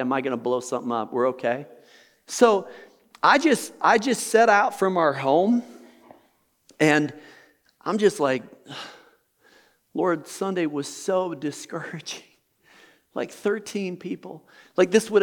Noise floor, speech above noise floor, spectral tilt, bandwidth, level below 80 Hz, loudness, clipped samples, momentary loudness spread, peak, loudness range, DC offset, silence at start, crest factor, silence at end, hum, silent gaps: -65 dBFS; 42 dB; -4.5 dB/octave; 19.5 kHz; -80 dBFS; -23 LUFS; under 0.1%; 16 LU; -4 dBFS; 10 LU; under 0.1%; 0 s; 20 dB; 0 s; none; none